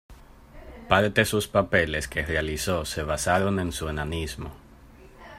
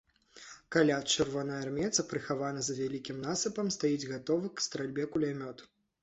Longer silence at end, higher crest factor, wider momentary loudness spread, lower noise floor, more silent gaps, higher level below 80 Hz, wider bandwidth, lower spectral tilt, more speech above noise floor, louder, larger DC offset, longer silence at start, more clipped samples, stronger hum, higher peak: second, 0 s vs 0.4 s; about the same, 22 dB vs 20 dB; about the same, 10 LU vs 12 LU; second, -49 dBFS vs -54 dBFS; neither; first, -42 dBFS vs -66 dBFS; first, 16 kHz vs 8.4 kHz; about the same, -4.5 dB/octave vs -3.5 dB/octave; about the same, 24 dB vs 21 dB; first, -25 LUFS vs -33 LUFS; neither; second, 0.1 s vs 0.35 s; neither; neither; first, -4 dBFS vs -12 dBFS